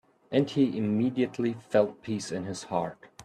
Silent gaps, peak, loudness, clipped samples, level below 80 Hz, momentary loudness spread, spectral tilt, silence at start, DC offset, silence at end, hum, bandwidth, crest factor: none; -10 dBFS; -29 LUFS; under 0.1%; -68 dBFS; 8 LU; -6.5 dB/octave; 0.3 s; under 0.1%; 0 s; none; 11 kHz; 18 dB